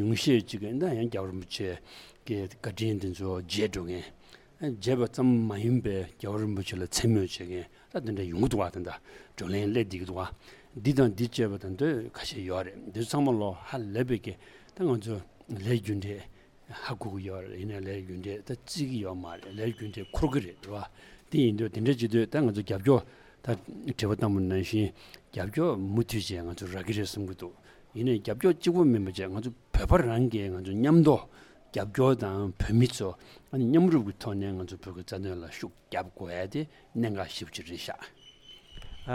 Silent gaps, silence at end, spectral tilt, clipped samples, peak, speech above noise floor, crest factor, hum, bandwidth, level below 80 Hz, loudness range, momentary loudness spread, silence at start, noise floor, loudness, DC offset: none; 0 s; -6.5 dB/octave; under 0.1%; -10 dBFS; 24 dB; 20 dB; none; 16 kHz; -46 dBFS; 9 LU; 15 LU; 0 s; -53 dBFS; -30 LUFS; under 0.1%